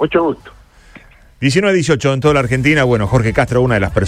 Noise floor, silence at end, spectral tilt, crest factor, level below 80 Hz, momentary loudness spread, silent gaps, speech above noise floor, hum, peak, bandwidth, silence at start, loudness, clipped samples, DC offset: -42 dBFS; 0 s; -6 dB/octave; 14 dB; -34 dBFS; 4 LU; none; 28 dB; none; 0 dBFS; 13 kHz; 0 s; -14 LUFS; under 0.1%; under 0.1%